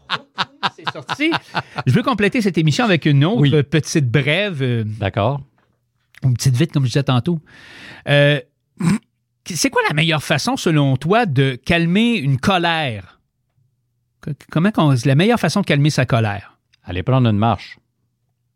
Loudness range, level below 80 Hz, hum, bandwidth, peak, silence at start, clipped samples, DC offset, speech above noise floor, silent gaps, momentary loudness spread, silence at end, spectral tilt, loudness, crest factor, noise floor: 3 LU; -48 dBFS; none; 16 kHz; 0 dBFS; 0.1 s; under 0.1%; under 0.1%; 52 dB; none; 11 LU; 0.8 s; -5.5 dB/octave; -17 LUFS; 18 dB; -68 dBFS